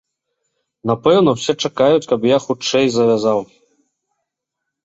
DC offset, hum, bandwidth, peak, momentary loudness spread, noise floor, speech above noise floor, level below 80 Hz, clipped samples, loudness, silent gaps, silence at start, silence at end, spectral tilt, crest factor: under 0.1%; none; 8.2 kHz; -2 dBFS; 7 LU; -79 dBFS; 64 dB; -58 dBFS; under 0.1%; -16 LUFS; none; 0.85 s; 1.4 s; -5 dB/octave; 16 dB